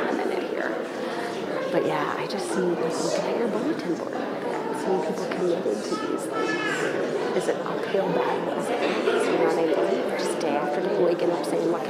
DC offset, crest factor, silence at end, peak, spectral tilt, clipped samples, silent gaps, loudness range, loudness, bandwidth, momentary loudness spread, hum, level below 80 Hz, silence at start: under 0.1%; 16 dB; 0 s; -10 dBFS; -5 dB/octave; under 0.1%; none; 3 LU; -26 LUFS; 15.5 kHz; 6 LU; none; -72 dBFS; 0 s